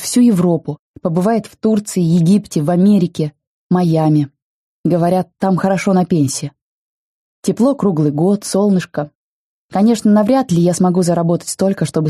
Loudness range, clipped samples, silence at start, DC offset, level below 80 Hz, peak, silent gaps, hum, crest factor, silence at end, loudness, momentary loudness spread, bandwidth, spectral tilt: 3 LU; under 0.1%; 0 s; under 0.1%; -56 dBFS; -2 dBFS; 0.79-0.94 s, 3.47-3.70 s, 4.42-4.84 s, 6.61-7.43 s, 9.15-9.69 s; none; 12 dB; 0 s; -15 LUFS; 11 LU; 13 kHz; -7 dB/octave